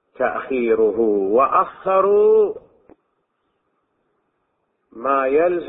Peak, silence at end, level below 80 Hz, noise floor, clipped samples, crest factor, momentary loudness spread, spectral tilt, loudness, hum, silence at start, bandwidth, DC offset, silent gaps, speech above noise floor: -4 dBFS; 0 s; -58 dBFS; -70 dBFS; under 0.1%; 16 dB; 9 LU; -11 dB/octave; -18 LUFS; none; 0.2 s; 3.9 kHz; under 0.1%; none; 53 dB